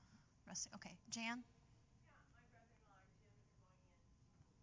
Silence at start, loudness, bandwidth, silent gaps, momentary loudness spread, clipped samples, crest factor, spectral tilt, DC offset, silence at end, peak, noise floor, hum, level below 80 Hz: 0 s; -50 LUFS; 7.8 kHz; none; 18 LU; under 0.1%; 26 dB; -2 dB/octave; under 0.1%; 0 s; -32 dBFS; -73 dBFS; none; -78 dBFS